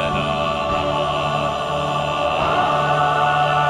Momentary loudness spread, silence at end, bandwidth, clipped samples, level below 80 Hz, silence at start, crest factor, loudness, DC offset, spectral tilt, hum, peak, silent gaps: 4 LU; 0 s; 14 kHz; under 0.1%; -40 dBFS; 0 s; 14 dB; -19 LUFS; under 0.1%; -5 dB/octave; none; -6 dBFS; none